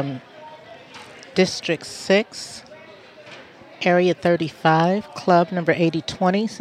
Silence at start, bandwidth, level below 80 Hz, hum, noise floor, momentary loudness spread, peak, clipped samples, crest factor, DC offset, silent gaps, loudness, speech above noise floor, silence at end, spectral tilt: 0 s; 12.5 kHz; -62 dBFS; none; -44 dBFS; 23 LU; -2 dBFS; under 0.1%; 20 dB; under 0.1%; none; -20 LUFS; 24 dB; 0 s; -5.5 dB/octave